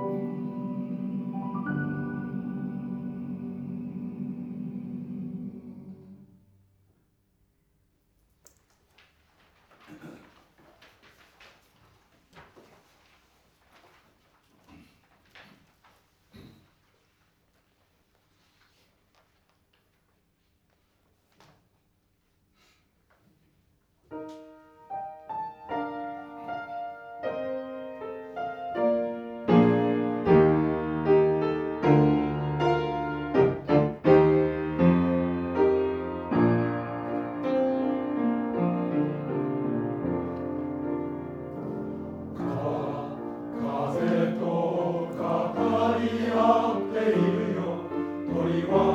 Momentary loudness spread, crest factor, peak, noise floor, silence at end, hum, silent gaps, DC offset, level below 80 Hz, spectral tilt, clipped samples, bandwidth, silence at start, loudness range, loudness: 16 LU; 22 dB; -8 dBFS; -70 dBFS; 0 s; none; none; under 0.1%; -56 dBFS; -9 dB/octave; under 0.1%; 7.8 kHz; 0 s; 15 LU; -27 LUFS